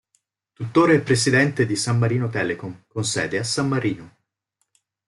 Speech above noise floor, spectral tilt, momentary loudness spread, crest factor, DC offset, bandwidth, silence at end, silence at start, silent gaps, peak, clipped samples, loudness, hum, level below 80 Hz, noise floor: 54 dB; -5 dB/octave; 12 LU; 18 dB; under 0.1%; 12 kHz; 1 s; 0.6 s; none; -4 dBFS; under 0.1%; -21 LUFS; none; -58 dBFS; -75 dBFS